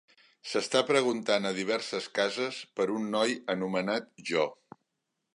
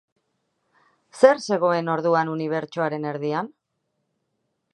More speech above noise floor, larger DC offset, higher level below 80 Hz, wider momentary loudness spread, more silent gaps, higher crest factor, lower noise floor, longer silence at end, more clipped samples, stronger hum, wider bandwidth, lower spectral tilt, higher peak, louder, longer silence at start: about the same, 53 dB vs 55 dB; neither; about the same, -78 dBFS vs -78 dBFS; second, 7 LU vs 10 LU; neither; about the same, 20 dB vs 24 dB; first, -83 dBFS vs -76 dBFS; second, 0.8 s vs 1.25 s; neither; neither; about the same, 11.5 kHz vs 10.5 kHz; second, -3.5 dB/octave vs -6 dB/octave; second, -10 dBFS vs -2 dBFS; second, -30 LUFS vs -22 LUFS; second, 0.45 s vs 1.15 s